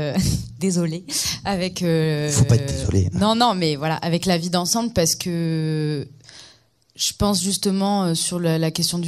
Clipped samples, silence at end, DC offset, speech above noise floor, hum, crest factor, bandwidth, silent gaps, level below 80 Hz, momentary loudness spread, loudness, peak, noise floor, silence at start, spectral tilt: under 0.1%; 0 s; under 0.1%; 34 dB; none; 18 dB; 15.5 kHz; none; -40 dBFS; 6 LU; -21 LUFS; -2 dBFS; -54 dBFS; 0 s; -4.5 dB/octave